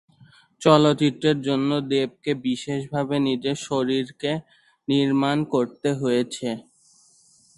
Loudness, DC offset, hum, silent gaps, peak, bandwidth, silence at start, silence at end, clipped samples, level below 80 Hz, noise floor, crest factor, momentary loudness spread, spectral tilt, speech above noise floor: -23 LUFS; under 0.1%; none; none; 0 dBFS; 11.5 kHz; 0.6 s; 0.95 s; under 0.1%; -62 dBFS; -58 dBFS; 22 dB; 10 LU; -6 dB/octave; 35 dB